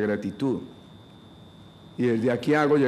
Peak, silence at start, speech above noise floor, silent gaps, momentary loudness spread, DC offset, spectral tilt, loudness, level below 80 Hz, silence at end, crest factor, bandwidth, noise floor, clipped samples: -10 dBFS; 0 s; 25 dB; none; 16 LU; under 0.1%; -7.5 dB/octave; -25 LUFS; -64 dBFS; 0 s; 16 dB; 13 kHz; -48 dBFS; under 0.1%